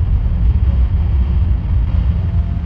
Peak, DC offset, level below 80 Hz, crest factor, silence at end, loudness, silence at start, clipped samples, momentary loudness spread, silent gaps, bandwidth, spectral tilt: -4 dBFS; under 0.1%; -16 dBFS; 10 dB; 0 s; -16 LUFS; 0 s; under 0.1%; 2 LU; none; 3.5 kHz; -10.5 dB/octave